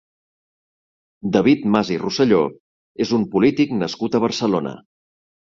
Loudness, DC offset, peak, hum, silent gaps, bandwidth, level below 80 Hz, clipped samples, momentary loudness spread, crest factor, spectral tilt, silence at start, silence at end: -19 LUFS; under 0.1%; -2 dBFS; none; 2.60-2.95 s; 7.6 kHz; -56 dBFS; under 0.1%; 8 LU; 18 dB; -6 dB/octave; 1.25 s; 0.65 s